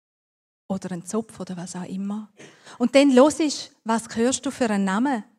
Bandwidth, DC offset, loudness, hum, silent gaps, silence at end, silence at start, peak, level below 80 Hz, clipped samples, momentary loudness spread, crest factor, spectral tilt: 13 kHz; under 0.1%; -23 LUFS; none; none; 0.15 s; 0.7 s; -2 dBFS; -66 dBFS; under 0.1%; 16 LU; 22 dB; -4.5 dB/octave